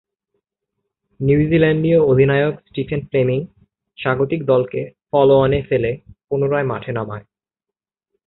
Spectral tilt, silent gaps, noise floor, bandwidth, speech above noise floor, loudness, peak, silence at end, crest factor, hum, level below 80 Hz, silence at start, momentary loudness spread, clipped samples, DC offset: -12.5 dB/octave; none; -86 dBFS; 4.1 kHz; 70 dB; -18 LUFS; -2 dBFS; 1.05 s; 16 dB; none; -44 dBFS; 1.2 s; 12 LU; under 0.1%; under 0.1%